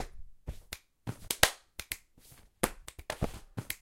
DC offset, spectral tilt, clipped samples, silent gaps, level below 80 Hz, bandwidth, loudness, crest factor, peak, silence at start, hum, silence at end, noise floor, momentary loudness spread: under 0.1%; -2.5 dB/octave; under 0.1%; none; -48 dBFS; 17 kHz; -34 LUFS; 36 dB; -2 dBFS; 0 s; none; 0.05 s; -59 dBFS; 20 LU